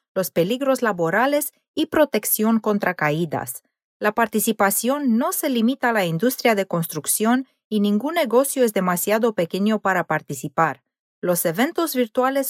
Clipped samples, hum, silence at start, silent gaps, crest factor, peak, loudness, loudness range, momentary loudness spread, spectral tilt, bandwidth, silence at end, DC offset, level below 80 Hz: under 0.1%; none; 0.15 s; 1.68-1.74 s, 3.84-4.00 s, 7.64-7.71 s, 10.99-11.22 s; 16 dB; -4 dBFS; -21 LUFS; 1 LU; 6 LU; -4.5 dB/octave; 16.5 kHz; 0 s; under 0.1%; -66 dBFS